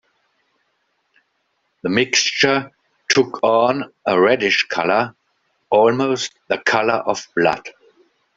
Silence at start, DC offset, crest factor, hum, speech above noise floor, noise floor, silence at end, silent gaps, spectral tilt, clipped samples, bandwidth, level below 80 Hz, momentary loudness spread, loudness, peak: 1.85 s; under 0.1%; 18 dB; none; 51 dB; -69 dBFS; 0.65 s; none; -3 dB/octave; under 0.1%; 7.8 kHz; -62 dBFS; 10 LU; -18 LUFS; 0 dBFS